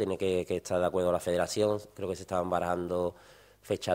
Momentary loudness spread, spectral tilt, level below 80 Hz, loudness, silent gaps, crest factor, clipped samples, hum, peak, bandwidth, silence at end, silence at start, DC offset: 8 LU; -5 dB/octave; -60 dBFS; -31 LUFS; none; 18 dB; under 0.1%; none; -14 dBFS; 16 kHz; 0 s; 0 s; under 0.1%